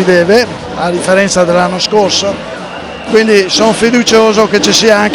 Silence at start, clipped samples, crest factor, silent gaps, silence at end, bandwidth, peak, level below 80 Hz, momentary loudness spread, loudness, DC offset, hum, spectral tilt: 0 s; 1%; 10 dB; none; 0 s; 19 kHz; 0 dBFS; -40 dBFS; 11 LU; -9 LUFS; under 0.1%; none; -3.5 dB/octave